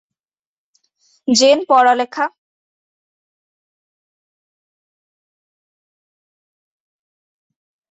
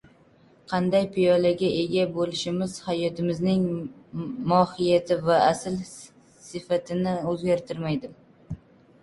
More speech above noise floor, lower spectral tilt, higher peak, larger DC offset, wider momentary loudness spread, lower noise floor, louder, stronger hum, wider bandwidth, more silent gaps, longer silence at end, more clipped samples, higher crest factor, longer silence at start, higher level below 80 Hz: first, over 77 dB vs 32 dB; second, -2 dB/octave vs -6 dB/octave; first, 0 dBFS vs -6 dBFS; neither; second, 11 LU vs 18 LU; first, under -90 dBFS vs -57 dBFS; first, -14 LUFS vs -25 LUFS; neither; second, 8.4 kHz vs 11.5 kHz; neither; first, 5.65 s vs 0.45 s; neither; about the same, 20 dB vs 20 dB; first, 1.3 s vs 0.7 s; second, -68 dBFS vs -58 dBFS